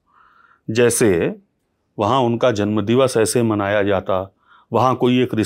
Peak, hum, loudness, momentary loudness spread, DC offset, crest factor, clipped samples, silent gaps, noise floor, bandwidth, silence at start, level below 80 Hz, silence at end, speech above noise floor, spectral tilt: -2 dBFS; none; -18 LUFS; 9 LU; under 0.1%; 16 dB; under 0.1%; none; -68 dBFS; 16 kHz; 0.7 s; -60 dBFS; 0 s; 52 dB; -5 dB/octave